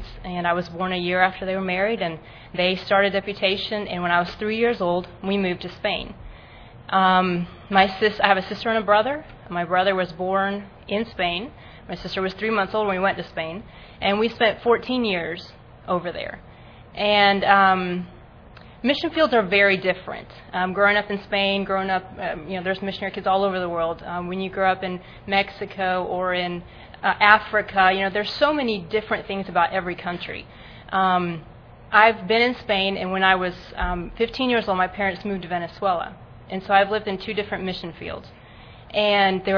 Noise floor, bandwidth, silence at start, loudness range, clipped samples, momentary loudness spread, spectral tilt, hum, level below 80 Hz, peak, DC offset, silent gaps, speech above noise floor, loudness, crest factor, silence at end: -45 dBFS; 5.4 kHz; 0 s; 5 LU; under 0.1%; 14 LU; -6.5 dB/octave; none; -48 dBFS; 0 dBFS; under 0.1%; none; 23 dB; -22 LUFS; 22 dB; 0 s